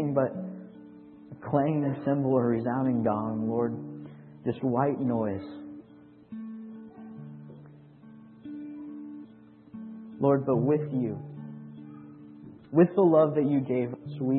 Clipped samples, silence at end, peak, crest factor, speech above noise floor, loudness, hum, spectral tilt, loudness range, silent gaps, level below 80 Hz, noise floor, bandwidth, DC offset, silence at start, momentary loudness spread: under 0.1%; 0 s; -8 dBFS; 22 dB; 27 dB; -27 LUFS; none; -13 dB/octave; 17 LU; none; -70 dBFS; -53 dBFS; 4.3 kHz; under 0.1%; 0 s; 23 LU